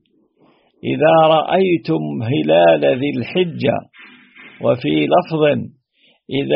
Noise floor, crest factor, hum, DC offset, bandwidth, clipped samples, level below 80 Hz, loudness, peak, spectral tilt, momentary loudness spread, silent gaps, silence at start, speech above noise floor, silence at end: -58 dBFS; 16 dB; none; under 0.1%; 5.6 kHz; under 0.1%; -58 dBFS; -16 LUFS; 0 dBFS; -4.5 dB/octave; 11 LU; none; 0.85 s; 43 dB; 0 s